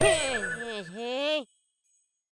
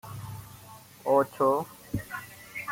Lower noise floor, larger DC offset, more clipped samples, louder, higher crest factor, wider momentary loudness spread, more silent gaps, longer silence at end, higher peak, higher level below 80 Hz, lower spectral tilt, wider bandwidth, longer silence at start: first, -73 dBFS vs -50 dBFS; neither; neither; about the same, -30 LUFS vs -29 LUFS; about the same, 20 dB vs 20 dB; second, 11 LU vs 21 LU; neither; first, 0.9 s vs 0 s; about the same, -10 dBFS vs -10 dBFS; about the same, -54 dBFS vs -58 dBFS; second, -2.5 dB/octave vs -6 dB/octave; second, 10.5 kHz vs 17 kHz; about the same, 0 s vs 0.05 s